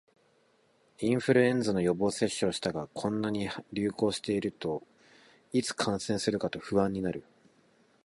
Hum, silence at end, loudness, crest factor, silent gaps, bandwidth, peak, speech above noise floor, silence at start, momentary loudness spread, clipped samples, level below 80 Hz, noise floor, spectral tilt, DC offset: none; 0.85 s; -30 LUFS; 20 dB; none; 11.5 kHz; -10 dBFS; 38 dB; 1 s; 9 LU; under 0.1%; -62 dBFS; -68 dBFS; -5 dB/octave; under 0.1%